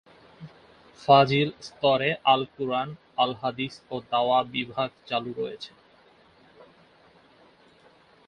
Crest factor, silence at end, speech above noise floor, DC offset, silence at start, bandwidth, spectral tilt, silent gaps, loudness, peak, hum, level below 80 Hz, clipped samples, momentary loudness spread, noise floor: 24 dB; 2.6 s; 33 dB; under 0.1%; 0.4 s; 9.8 kHz; -6 dB/octave; none; -25 LUFS; -4 dBFS; none; -66 dBFS; under 0.1%; 14 LU; -58 dBFS